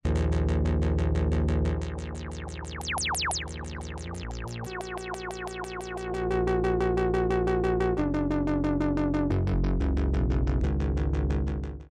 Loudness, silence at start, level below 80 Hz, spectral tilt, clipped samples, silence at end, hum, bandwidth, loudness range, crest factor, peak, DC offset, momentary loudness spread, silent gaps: -29 LUFS; 0.05 s; -32 dBFS; -6 dB/octave; under 0.1%; 0.05 s; none; 12.5 kHz; 6 LU; 12 dB; -16 dBFS; under 0.1%; 11 LU; none